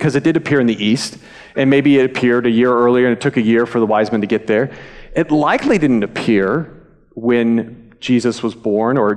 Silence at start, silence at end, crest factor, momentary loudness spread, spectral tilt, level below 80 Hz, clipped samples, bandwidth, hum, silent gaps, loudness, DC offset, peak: 0 s; 0 s; 12 dB; 9 LU; -6.5 dB/octave; -48 dBFS; under 0.1%; 11 kHz; none; none; -15 LUFS; under 0.1%; -4 dBFS